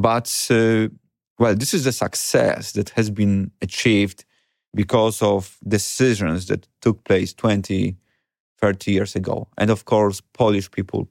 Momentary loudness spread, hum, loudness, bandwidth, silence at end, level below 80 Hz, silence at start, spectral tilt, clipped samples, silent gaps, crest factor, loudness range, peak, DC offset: 8 LU; none; -20 LUFS; 17 kHz; 0.05 s; -54 dBFS; 0 s; -5 dB/octave; under 0.1%; 1.27-1.36 s, 4.68-4.72 s, 8.40-8.56 s; 18 dB; 2 LU; -2 dBFS; under 0.1%